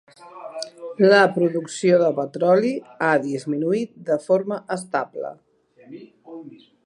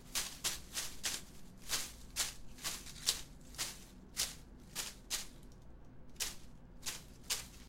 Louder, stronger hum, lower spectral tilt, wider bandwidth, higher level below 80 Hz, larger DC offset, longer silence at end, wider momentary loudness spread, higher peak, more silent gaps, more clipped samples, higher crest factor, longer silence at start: first, -20 LUFS vs -41 LUFS; neither; first, -5.5 dB/octave vs 0 dB/octave; second, 11.5 kHz vs 16.5 kHz; second, -76 dBFS vs -58 dBFS; neither; first, 0.3 s vs 0 s; about the same, 20 LU vs 19 LU; first, -2 dBFS vs -10 dBFS; neither; neither; second, 20 dB vs 34 dB; first, 0.2 s vs 0 s